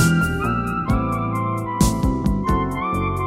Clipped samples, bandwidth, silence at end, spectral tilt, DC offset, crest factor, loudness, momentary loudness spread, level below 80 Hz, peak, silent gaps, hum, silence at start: under 0.1%; 16.5 kHz; 0 s; -6 dB/octave; under 0.1%; 16 dB; -21 LUFS; 4 LU; -28 dBFS; -2 dBFS; none; none; 0 s